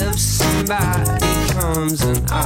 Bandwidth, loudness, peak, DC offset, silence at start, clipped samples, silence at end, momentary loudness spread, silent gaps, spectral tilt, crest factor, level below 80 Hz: 16.5 kHz; -18 LUFS; -4 dBFS; under 0.1%; 0 s; under 0.1%; 0 s; 2 LU; none; -4.5 dB/octave; 14 dB; -26 dBFS